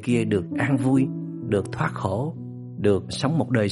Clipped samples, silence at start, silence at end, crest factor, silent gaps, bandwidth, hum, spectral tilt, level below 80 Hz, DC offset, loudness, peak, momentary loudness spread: under 0.1%; 0 s; 0 s; 16 dB; none; 11.5 kHz; none; -7 dB/octave; -56 dBFS; under 0.1%; -24 LUFS; -6 dBFS; 9 LU